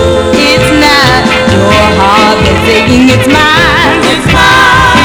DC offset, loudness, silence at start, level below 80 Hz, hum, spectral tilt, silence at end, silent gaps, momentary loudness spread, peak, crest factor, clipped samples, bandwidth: under 0.1%; -5 LUFS; 0 s; -22 dBFS; none; -4.5 dB/octave; 0 s; none; 3 LU; 0 dBFS; 6 dB; 5%; over 20 kHz